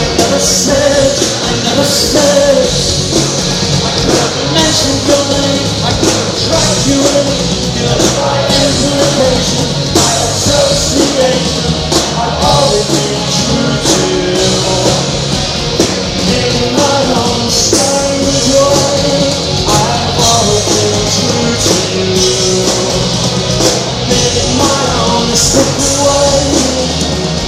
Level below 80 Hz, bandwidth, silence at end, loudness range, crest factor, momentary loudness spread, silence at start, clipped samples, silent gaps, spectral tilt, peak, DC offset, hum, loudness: -28 dBFS; 16.5 kHz; 0 s; 1 LU; 10 dB; 4 LU; 0 s; 0.1%; none; -3.5 dB/octave; 0 dBFS; under 0.1%; none; -10 LUFS